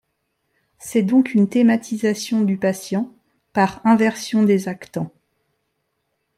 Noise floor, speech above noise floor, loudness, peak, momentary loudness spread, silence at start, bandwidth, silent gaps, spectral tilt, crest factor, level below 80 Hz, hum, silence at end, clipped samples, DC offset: -73 dBFS; 55 dB; -19 LUFS; -4 dBFS; 13 LU; 0.85 s; 15 kHz; none; -6 dB/octave; 16 dB; -64 dBFS; none; 1.3 s; under 0.1%; under 0.1%